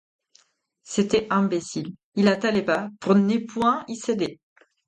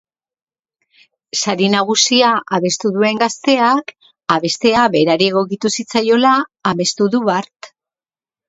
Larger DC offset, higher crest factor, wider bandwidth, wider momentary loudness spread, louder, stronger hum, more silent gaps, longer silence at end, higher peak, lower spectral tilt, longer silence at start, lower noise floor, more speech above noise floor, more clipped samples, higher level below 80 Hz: neither; about the same, 18 dB vs 16 dB; first, 9.2 kHz vs 8.2 kHz; first, 10 LU vs 7 LU; second, -24 LUFS vs -15 LUFS; neither; first, 2.04-2.12 s vs none; second, 0.55 s vs 0.8 s; second, -6 dBFS vs 0 dBFS; first, -5.5 dB/octave vs -3.5 dB/octave; second, 0.9 s vs 1.35 s; second, -65 dBFS vs under -90 dBFS; second, 43 dB vs over 75 dB; neither; about the same, -62 dBFS vs -58 dBFS